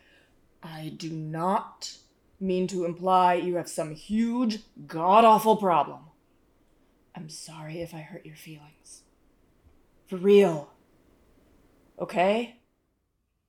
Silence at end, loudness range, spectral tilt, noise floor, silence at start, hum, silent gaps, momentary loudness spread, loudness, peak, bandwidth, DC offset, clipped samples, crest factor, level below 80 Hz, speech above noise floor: 1 s; 19 LU; -6 dB/octave; -76 dBFS; 0.65 s; none; none; 22 LU; -25 LUFS; -6 dBFS; 17.5 kHz; under 0.1%; under 0.1%; 22 dB; -66 dBFS; 50 dB